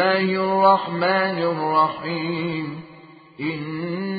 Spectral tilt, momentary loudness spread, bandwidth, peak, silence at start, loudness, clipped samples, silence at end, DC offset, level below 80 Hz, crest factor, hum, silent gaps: -10.5 dB/octave; 12 LU; 5 kHz; -4 dBFS; 0 s; -21 LUFS; under 0.1%; 0 s; under 0.1%; -66 dBFS; 18 dB; none; none